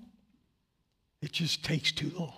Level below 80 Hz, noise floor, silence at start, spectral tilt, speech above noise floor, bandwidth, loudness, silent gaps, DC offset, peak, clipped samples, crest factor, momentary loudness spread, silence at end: -64 dBFS; -77 dBFS; 0 s; -4 dB/octave; 44 dB; 15.5 kHz; -31 LUFS; none; under 0.1%; -14 dBFS; under 0.1%; 22 dB; 8 LU; 0 s